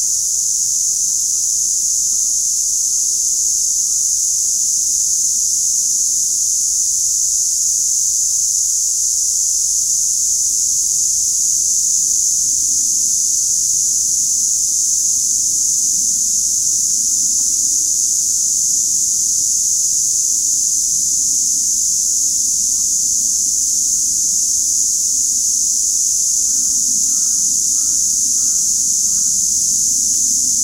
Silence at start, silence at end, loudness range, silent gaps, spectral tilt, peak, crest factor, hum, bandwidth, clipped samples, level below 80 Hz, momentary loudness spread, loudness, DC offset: 0 s; 0 s; 1 LU; none; 2 dB/octave; -2 dBFS; 14 dB; none; 16 kHz; under 0.1%; -48 dBFS; 1 LU; -12 LUFS; under 0.1%